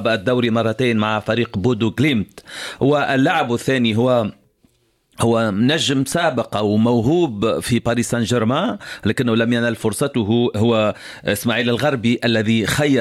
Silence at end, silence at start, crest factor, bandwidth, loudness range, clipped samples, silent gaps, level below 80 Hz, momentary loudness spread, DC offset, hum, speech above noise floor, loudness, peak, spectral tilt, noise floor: 0 s; 0 s; 14 dB; 15 kHz; 1 LU; under 0.1%; none; -50 dBFS; 5 LU; under 0.1%; none; 43 dB; -18 LUFS; -4 dBFS; -5.5 dB/octave; -61 dBFS